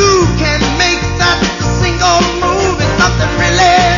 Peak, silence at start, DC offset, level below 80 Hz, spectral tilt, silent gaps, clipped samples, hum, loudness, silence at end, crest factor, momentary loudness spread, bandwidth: 0 dBFS; 0 s; under 0.1%; -22 dBFS; -4 dB/octave; none; under 0.1%; none; -11 LUFS; 0 s; 10 dB; 4 LU; 7.4 kHz